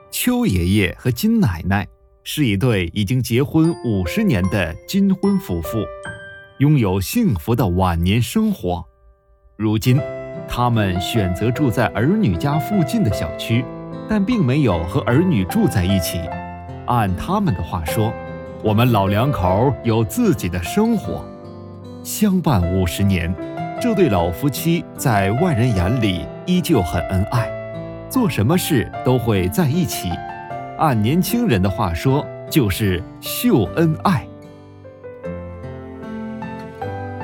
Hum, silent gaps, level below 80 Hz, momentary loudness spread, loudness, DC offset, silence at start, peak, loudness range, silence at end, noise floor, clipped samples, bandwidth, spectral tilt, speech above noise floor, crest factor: none; none; -38 dBFS; 13 LU; -19 LUFS; under 0.1%; 0.1 s; 0 dBFS; 2 LU; 0 s; -52 dBFS; under 0.1%; 19 kHz; -6.5 dB/octave; 35 dB; 18 dB